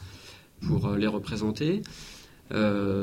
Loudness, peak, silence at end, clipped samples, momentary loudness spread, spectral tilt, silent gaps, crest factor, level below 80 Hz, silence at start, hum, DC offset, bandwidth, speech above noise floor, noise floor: -28 LUFS; -14 dBFS; 0 s; under 0.1%; 20 LU; -7 dB/octave; none; 16 dB; -50 dBFS; 0 s; none; under 0.1%; 15.5 kHz; 22 dB; -49 dBFS